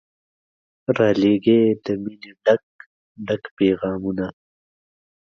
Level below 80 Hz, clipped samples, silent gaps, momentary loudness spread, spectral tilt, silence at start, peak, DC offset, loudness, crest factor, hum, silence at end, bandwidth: -56 dBFS; under 0.1%; 2.63-2.79 s, 2.86-3.15 s, 3.51-3.57 s; 13 LU; -8 dB/octave; 0.9 s; -4 dBFS; under 0.1%; -20 LUFS; 18 dB; none; 1 s; 6.8 kHz